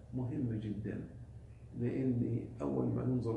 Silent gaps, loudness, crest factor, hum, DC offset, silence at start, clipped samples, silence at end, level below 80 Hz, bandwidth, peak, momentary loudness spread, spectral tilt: none; -37 LUFS; 16 dB; none; under 0.1%; 0 s; under 0.1%; 0 s; -58 dBFS; 8.4 kHz; -22 dBFS; 16 LU; -10.5 dB/octave